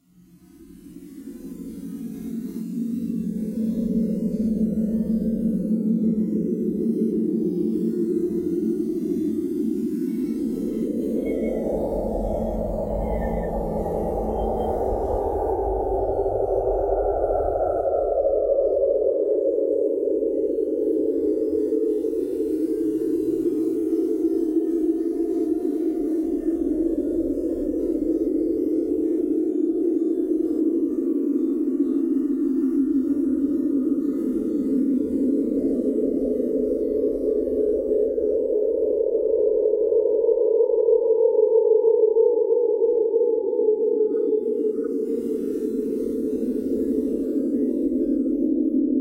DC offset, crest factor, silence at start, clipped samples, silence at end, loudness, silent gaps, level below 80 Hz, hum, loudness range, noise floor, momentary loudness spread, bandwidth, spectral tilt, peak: under 0.1%; 14 dB; 0.6 s; under 0.1%; 0 s; -23 LUFS; none; -40 dBFS; none; 6 LU; -52 dBFS; 6 LU; 16 kHz; -10 dB/octave; -8 dBFS